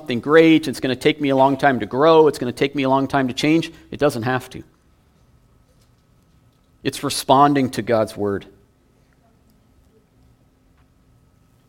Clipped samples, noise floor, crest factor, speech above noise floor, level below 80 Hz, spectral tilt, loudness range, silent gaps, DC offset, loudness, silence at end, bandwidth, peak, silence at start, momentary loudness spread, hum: under 0.1%; -57 dBFS; 20 dB; 40 dB; -54 dBFS; -5.5 dB/octave; 11 LU; none; under 0.1%; -18 LUFS; 3.25 s; 17 kHz; 0 dBFS; 0.05 s; 12 LU; none